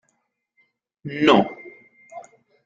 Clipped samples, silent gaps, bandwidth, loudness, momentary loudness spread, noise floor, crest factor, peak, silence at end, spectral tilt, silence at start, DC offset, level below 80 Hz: under 0.1%; none; 7.8 kHz; -19 LUFS; 25 LU; -72 dBFS; 22 dB; -2 dBFS; 0.45 s; -6 dB/octave; 1.05 s; under 0.1%; -64 dBFS